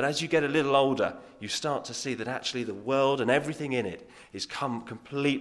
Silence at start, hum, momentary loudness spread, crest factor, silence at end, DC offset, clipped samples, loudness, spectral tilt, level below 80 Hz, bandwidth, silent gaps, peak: 0 s; none; 13 LU; 20 dB; 0 s; under 0.1%; under 0.1%; -29 LUFS; -4.5 dB/octave; -68 dBFS; 12 kHz; none; -8 dBFS